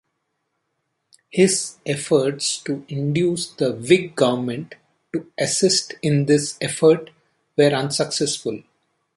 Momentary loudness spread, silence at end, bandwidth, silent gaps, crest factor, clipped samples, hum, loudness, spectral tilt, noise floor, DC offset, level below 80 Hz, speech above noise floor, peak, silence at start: 11 LU; 0.55 s; 11.5 kHz; none; 20 dB; under 0.1%; none; -20 LUFS; -4.5 dB/octave; -74 dBFS; under 0.1%; -64 dBFS; 55 dB; -2 dBFS; 1.35 s